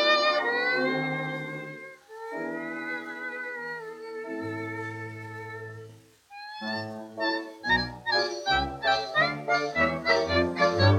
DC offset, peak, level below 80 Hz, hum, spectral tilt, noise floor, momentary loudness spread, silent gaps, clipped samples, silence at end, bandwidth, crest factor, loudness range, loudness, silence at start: under 0.1%; -8 dBFS; -54 dBFS; none; -5 dB/octave; -51 dBFS; 16 LU; none; under 0.1%; 0 s; 13.5 kHz; 20 dB; 11 LU; -28 LUFS; 0 s